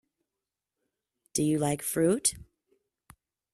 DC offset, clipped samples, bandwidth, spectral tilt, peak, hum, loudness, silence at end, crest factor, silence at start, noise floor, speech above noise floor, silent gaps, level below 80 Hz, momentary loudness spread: under 0.1%; under 0.1%; 14.5 kHz; -4.5 dB/octave; -12 dBFS; none; -28 LUFS; 1.1 s; 22 dB; 1.35 s; -89 dBFS; 62 dB; none; -62 dBFS; 8 LU